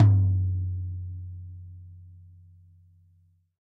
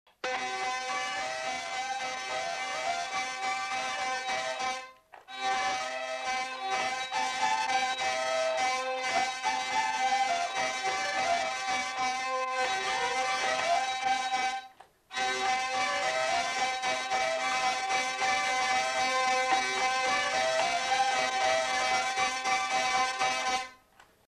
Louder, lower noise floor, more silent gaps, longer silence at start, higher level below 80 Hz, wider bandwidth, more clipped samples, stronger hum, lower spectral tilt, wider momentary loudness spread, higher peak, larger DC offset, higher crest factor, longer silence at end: about the same, -28 LUFS vs -29 LUFS; about the same, -63 dBFS vs -61 dBFS; neither; second, 0 s vs 0.25 s; first, -52 dBFS vs -68 dBFS; second, 2.1 kHz vs 13.5 kHz; neither; neither; first, -11.5 dB/octave vs 0 dB/octave; first, 25 LU vs 6 LU; first, -8 dBFS vs -14 dBFS; neither; about the same, 20 dB vs 16 dB; first, 1.55 s vs 0.5 s